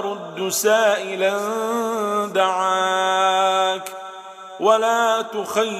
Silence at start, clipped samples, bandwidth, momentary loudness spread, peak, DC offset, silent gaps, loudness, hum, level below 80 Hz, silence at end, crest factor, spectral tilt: 0 s; under 0.1%; 15.5 kHz; 11 LU; -4 dBFS; under 0.1%; none; -20 LUFS; none; -78 dBFS; 0 s; 16 dB; -2 dB/octave